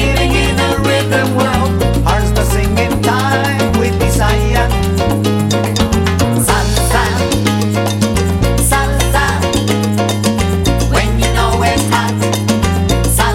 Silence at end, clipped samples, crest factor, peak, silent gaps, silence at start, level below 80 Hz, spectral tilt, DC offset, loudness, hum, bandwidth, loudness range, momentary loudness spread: 0 s; under 0.1%; 12 dB; 0 dBFS; none; 0 s; -20 dBFS; -5 dB/octave; under 0.1%; -13 LUFS; none; 16.5 kHz; 0 LU; 2 LU